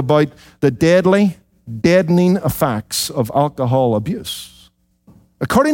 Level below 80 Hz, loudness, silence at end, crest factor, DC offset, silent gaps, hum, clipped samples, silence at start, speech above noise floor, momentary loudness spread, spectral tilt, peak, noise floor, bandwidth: -46 dBFS; -16 LUFS; 0 s; 14 dB; under 0.1%; none; none; under 0.1%; 0 s; 36 dB; 13 LU; -6 dB/octave; -2 dBFS; -52 dBFS; 17 kHz